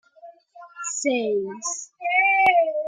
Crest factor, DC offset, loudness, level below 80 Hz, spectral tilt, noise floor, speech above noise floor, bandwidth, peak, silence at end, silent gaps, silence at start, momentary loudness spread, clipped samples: 18 dB; under 0.1%; -21 LUFS; -74 dBFS; -1.5 dB/octave; -48 dBFS; 27 dB; 9.8 kHz; -6 dBFS; 0 s; none; 0.25 s; 13 LU; under 0.1%